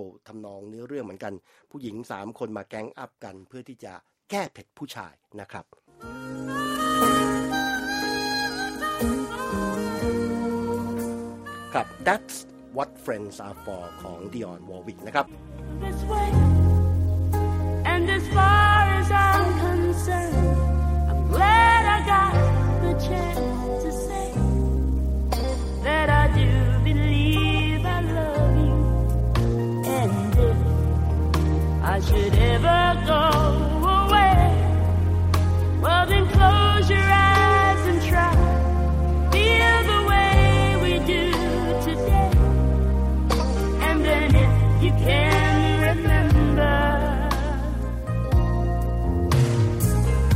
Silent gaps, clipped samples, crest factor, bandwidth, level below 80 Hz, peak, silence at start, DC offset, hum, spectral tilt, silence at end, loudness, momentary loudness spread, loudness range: none; under 0.1%; 18 dB; 16 kHz; -26 dBFS; -2 dBFS; 0 s; under 0.1%; none; -6 dB/octave; 0 s; -21 LUFS; 19 LU; 14 LU